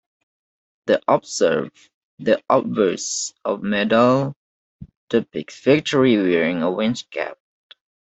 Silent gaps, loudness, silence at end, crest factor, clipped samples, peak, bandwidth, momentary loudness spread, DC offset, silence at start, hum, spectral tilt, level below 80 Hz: 1.94-2.18 s, 4.36-4.79 s, 4.97-5.08 s; -20 LUFS; 0.7 s; 18 dB; under 0.1%; -2 dBFS; 8.4 kHz; 12 LU; under 0.1%; 0.85 s; none; -4.5 dB/octave; -60 dBFS